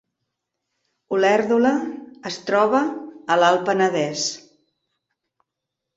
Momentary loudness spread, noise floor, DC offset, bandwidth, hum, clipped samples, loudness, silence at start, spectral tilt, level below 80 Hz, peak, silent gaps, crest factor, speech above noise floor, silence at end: 15 LU; -83 dBFS; under 0.1%; 8 kHz; none; under 0.1%; -20 LUFS; 1.1 s; -4 dB/octave; -68 dBFS; -4 dBFS; none; 18 dB; 64 dB; 1.55 s